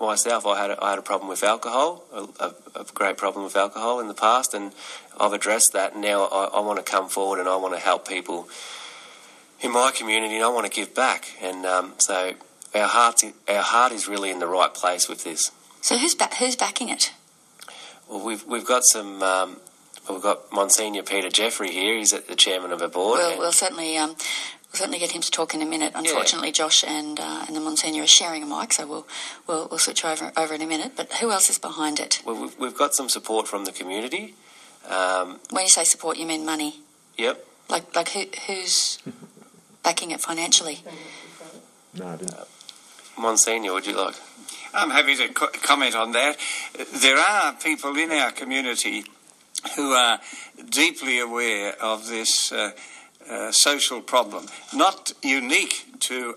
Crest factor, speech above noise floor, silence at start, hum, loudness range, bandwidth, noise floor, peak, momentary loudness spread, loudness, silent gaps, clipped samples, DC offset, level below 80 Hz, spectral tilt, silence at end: 24 dB; 28 dB; 0 s; none; 5 LU; 15 kHz; -52 dBFS; 0 dBFS; 16 LU; -22 LUFS; none; under 0.1%; under 0.1%; -86 dBFS; 0 dB/octave; 0 s